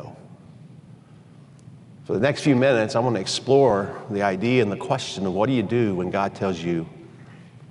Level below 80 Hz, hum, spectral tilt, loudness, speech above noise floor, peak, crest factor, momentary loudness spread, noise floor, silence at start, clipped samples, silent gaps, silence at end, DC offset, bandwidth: -60 dBFS; none; -6 dB/octave; -22 LUFS; 26 dB; -6 dBFS; 18 dB; 10 LU; -48 dBFS; 0 s; under 0.1%; none; 0.05 s; under 0.1%; 11.5 kHz